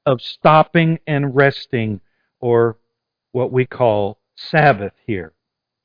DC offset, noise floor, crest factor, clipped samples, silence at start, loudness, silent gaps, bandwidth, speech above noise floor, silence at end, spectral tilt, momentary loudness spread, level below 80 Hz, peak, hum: under 0.1%; -77 dBFS; 18 dB; under 0.1%; 0.05 s; -17 LUFS; none; 5.2 kHz; 60 dB; 0.55 s; -9 dB/octave; 13 LU; -52 dBFS; 0 dBFS; none